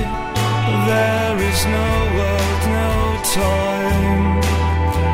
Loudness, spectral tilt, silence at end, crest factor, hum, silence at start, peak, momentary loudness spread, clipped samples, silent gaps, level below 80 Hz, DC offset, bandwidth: -18 LUFS; -5 dB/octave; 0 s; 10 dB; none; 0 s; -6 dBFS; 2 LU; under 0.1%; none; -24 dBFS; under 0.1%; 16 kHz